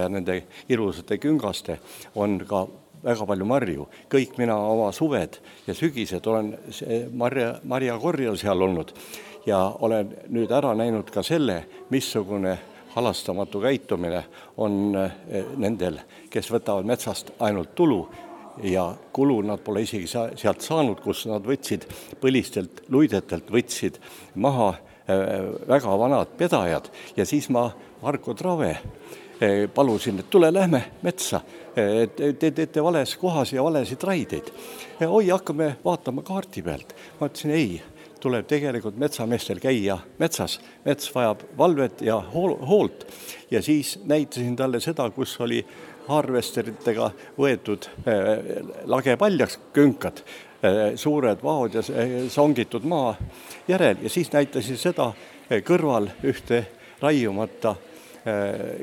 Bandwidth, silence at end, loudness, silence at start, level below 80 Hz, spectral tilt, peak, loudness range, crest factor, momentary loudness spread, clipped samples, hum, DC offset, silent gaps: 18 kHz; 0 s; -24 LUFS; 0 s; -56 dBFS; -5.5 dB/octave; -4 dBFS; 4 LU; 20 dB; 11 LU; under 0.1%; none; under 0.1%; none